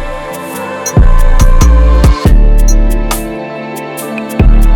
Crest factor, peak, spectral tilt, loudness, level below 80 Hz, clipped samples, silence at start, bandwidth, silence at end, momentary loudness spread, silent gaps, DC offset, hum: 6 dB; 0 dBFS; -6 dB/octave; -12 LUFS; -8 dBFS; under 0.1%; 0 s; 17 kHz; 0 s; 12 LU; none; under 0.1%; none